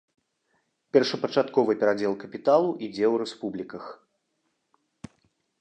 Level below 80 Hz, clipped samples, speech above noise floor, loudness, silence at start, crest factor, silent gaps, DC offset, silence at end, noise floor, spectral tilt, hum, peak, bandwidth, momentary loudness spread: -72 dBFS; under 0.1%; 51 dB; -25 LUFS; 0.95 s; 22 dB; none; under 0.1%; 1.65 s; -76 dBFS; -5.5 dB/octave; none; -6 dBFS; 8.8 kHz; 13 LU